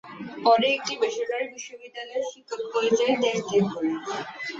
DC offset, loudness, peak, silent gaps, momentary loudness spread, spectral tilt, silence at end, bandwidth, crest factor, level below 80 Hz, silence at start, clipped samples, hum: under 0.1%; -25 LUFS; -8 dBFS; none; 14 LU; -4 dB/octave; 0 s; 7.8 kHz; 18 dB; -70 dBFS; 0.05 s; under 0.1%; none